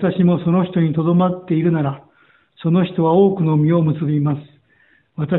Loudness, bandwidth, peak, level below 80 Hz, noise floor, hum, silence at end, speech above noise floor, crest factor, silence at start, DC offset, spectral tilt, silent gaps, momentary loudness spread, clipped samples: -17 LUFS; 4.1 kHz; -2 dBFS; -54 dBFS; -57 dBFS; none; 0 s; 41 dB; 14 dB; 0 s; under 0.1%; -13 dB/octave; none; 11 LU; under 0.1%